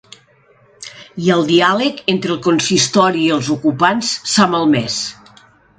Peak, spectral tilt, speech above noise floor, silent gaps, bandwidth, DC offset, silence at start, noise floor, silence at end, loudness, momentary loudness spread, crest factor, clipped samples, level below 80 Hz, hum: 0 dBFS; -4 dB/octave; 37 dB; none; 9.4 kHz; under 0.1%; 0.8 s; -51 dBFS; 0.65 s; -15 LUFS; 11 LU; 16 dB; under 0.1%; -56 dBFS; none